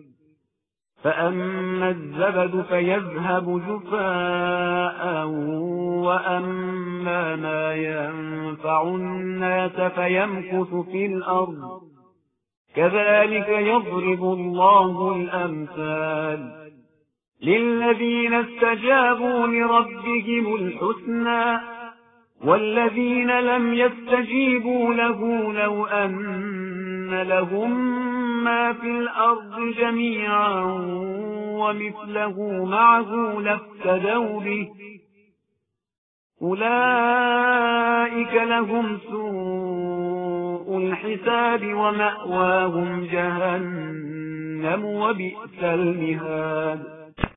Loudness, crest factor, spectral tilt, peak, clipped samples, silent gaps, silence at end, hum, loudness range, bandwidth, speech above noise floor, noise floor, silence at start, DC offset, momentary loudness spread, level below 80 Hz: -22 LUFS; 22 dB; -10.5 dB/octave; 0 dBFS; under 0.1%; 12.57-12.65 s, 35.98-36.30 s; 0.05 s; none; 5 LU; 4 kHz; 60 dB; -82 dBFS; 1.05 s; under 0.1%; 10 LU; -56 dBFS